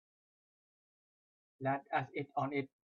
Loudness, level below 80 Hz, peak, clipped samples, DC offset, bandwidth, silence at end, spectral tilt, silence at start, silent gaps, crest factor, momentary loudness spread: -39 LUFS; -84 dBFS; -22 dBFS; under 0.1%; under 0.1%; 6.8 kHz; 0.3 s; -5.5 dB/octave; 1.6 s; none; 20 dB; 5 LU